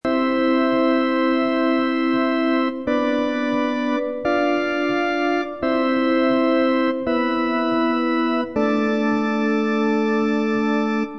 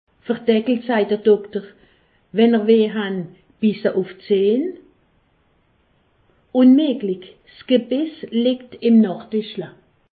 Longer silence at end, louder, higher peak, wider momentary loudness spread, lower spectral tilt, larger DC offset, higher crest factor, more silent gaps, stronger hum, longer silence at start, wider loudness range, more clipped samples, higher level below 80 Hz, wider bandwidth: second, 0 s vs 0.45 s; about the same, -20 LUFS vs -19 LUFS; second, -8 dBFS vs -4 dBFS; second, 3 LU vs 14 LU; second, -6 dB/octave vs -11.5 dB/octave; first, 0.4% vs under 0.1%; about the same, 12 dB vs 16 dB; neither; neither; second, 0.05 s vs 0.3 s; second, 1 LU vs 5 LU; neither; first, -56 dBFS vs -66 dBFS; first, 7.4 kHz vs 4.8 kHz